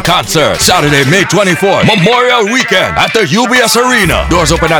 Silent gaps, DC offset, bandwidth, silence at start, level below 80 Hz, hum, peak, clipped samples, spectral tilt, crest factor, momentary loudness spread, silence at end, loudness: none; under 0.1%; over 20 kHz; 0 s; -26 dBFS; none; 0 dBFS; 2%; -3.5 dB/octave; 8 dB; 2 LU; 0 s; -8 LUFS